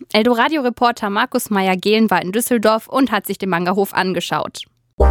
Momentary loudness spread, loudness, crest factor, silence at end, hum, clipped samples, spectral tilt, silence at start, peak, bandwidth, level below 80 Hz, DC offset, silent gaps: 6 LU; -17 LUFS; 16 dB; 0 s; none; under 0.1%; -5 dB/octave; 0 s; -2 dBFS; 18 kHz; -34 dBFS; under 0.1%; 4.93-4.98 s